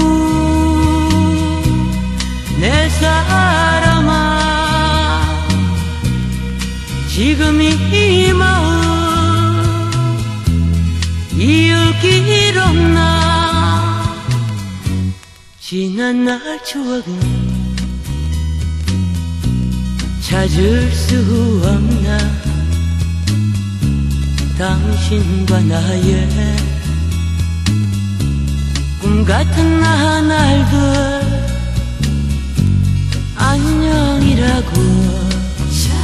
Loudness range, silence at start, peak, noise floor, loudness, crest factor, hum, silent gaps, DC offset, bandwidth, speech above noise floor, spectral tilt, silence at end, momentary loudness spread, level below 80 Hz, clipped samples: 6 LU; 0 s; 0 dBFS; -38 dBFS; -14 LUFS; 14 dB; none; none; under 0.1%; 13.5 kHz; 26 dB; -5.5 dB/octave; 0 s; 8 LU; -22 dBFS; under 0.1%